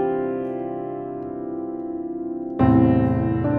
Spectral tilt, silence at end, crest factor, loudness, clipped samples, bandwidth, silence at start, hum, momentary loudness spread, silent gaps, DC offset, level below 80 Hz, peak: -12 dB/octave; 0 s; 16 dB; -23 LUFS; under 0.1%; 4 kHz; 0 s; none; 13 LU; none; under 0.1%; -46 dBFS; -6 dBFS